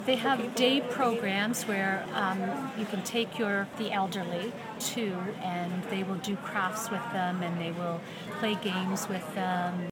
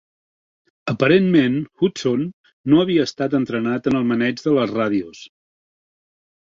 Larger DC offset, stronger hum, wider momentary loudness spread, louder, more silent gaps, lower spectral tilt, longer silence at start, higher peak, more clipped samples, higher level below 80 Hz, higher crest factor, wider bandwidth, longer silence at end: neither; neither; second, 7 LU vs 11 LU; second, -31 LUFS vs -19 LUFS; second, none vs 2.33-2.44 s, 2.53-2.64 s; second, -4.5 dB/octave vs -6.5 dB/octave; second, 0 s vs 0.85 s; second, -10 dBFS vs -2 dBFS; neither; second, -74 dBFS vs -58 dBFS; about the same, 20 dB vs 18 dB; first, 19 kHz vs 7.6 kHz; second, 0 s vs 1.2 s